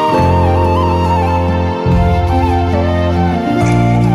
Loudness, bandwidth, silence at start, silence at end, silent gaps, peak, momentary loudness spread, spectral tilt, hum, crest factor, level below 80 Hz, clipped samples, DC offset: -13 LUFS; 11.5 kHz; 0 s; 0 s; none; -2 dBFS; 3 LU; -8 dB/octave; none; 8 dB; -22 dBFS; under 0.1%; under 0.1%